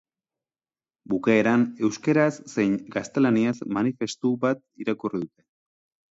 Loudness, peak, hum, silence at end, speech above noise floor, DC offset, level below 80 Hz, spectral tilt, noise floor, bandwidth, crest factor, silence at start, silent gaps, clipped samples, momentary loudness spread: -24 LUFS; -6 dBFS; none; 0.85 s; over 66 dB; under 0.1%; -66 dBFS; -6.5 dB/octave; under -90 dBFS; 8 kHz; 18 dB; 1.1 s; none; under 0.1%; 9 LU